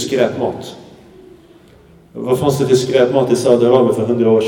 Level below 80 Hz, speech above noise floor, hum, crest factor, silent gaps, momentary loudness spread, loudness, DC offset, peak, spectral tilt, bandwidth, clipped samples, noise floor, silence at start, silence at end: -52 dBFS; 31 dB; none; 16 dB; none; 16 LU; -14 LUFS; under 0.1%; 0 dBFS; -6 dB/octave; 17.5 kHz; under 0.1%; -45 dBFS; 0 s; 0 s